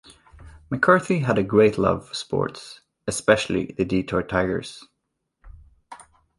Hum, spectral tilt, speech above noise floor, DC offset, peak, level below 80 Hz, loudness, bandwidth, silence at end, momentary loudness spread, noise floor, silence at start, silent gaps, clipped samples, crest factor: none; -5.5 dB/octave; 56 dB; under 0.1%; -2 dBFS; -48 dBFS; -22 LUFS; 11.5 kHz; 0.45 s; 14 LU; -78 dBFS; 0.4 s; none; under 0.1%; 22 dB